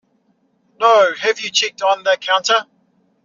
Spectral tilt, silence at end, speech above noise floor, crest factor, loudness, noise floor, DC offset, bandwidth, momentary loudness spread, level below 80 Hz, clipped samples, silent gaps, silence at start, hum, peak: 3 dB/octave; 0.6 s; 46 dB; 16 dB; -15 LUFS; -62 dBFS; under 0.1%; 7.6 kHz; 5 LU; -74 dBFS; under 0.1%; none; 0.8 s; none; -2 dBFS